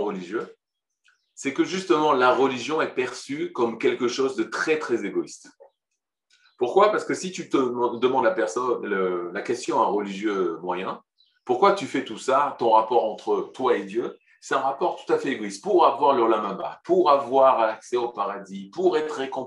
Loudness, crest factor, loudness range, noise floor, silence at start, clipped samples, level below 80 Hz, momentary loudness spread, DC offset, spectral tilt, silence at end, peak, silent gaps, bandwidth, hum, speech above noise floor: -24 LUFS; 20 dB; 5 LU; -83 dBFS; 0 s; under 0.1%; -78 dBFS; 11 LU; under 0.1%; -4.5 dB/octave; 0 s; -4 dBFS; none; 11 kHz; none; 60 dB